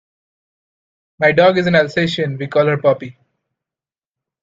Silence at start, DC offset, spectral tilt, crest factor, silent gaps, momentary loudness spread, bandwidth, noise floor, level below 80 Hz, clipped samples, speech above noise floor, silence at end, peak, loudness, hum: 1.2 s; under 0.1%; -6.5 dB/octave; 18 dB; none; 9 LU; 7.8 kHz; under -90 dBFS; -58 dBFS; under 0.1%; over 75 dB; 1.3 s; 0 dBFS; -15 LUFS; none